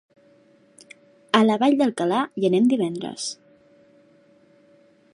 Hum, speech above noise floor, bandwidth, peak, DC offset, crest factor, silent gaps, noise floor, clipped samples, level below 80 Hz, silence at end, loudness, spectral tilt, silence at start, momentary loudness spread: none; 36 dB; 11.5 kHz; -2 dBFS; under 0.1%; 22 dB; none; -56 dBFS; under 0.1%; -76 dBFS; 1.8 s; -21 LUFS; -5 dB/octave; 1.35 s; 12 LU